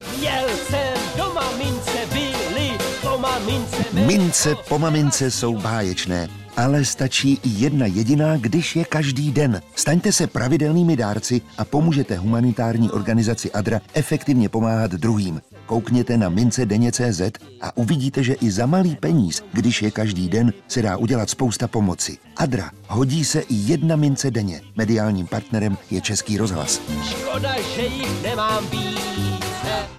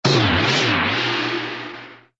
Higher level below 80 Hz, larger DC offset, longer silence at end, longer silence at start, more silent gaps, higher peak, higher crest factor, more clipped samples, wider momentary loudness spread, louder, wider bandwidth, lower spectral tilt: about the same, -44 dBFS vs -44 dBFS; neither; second, 0 s vs 0.25 s; about the same, 0 s vs 0.05 s; neither; second, -8 dBFS vs -4 dBFS; about the same, 12 dB vs 16 dB; neither; second, 6 LU vs 15 LU; about the same, -20 LUFS vs -18 LUFS; first, 15 kHz vs 8 kHz; about the same, -5 dB/octave vs -4.5 dB/octave